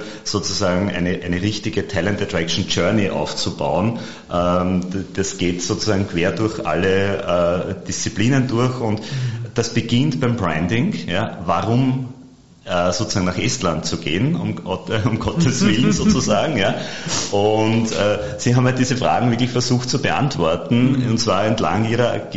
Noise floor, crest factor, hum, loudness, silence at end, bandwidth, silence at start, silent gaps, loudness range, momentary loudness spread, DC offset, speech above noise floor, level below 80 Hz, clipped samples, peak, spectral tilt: -44 dBFS; 16 dB; none; -19 LUFS; 0 s; 8 kHz; 0 s; none; 3 LU; 7 LU; 1%; 25 dB; -44 dBFS; under 0.1%; -4 dBFS; -5 dB/octave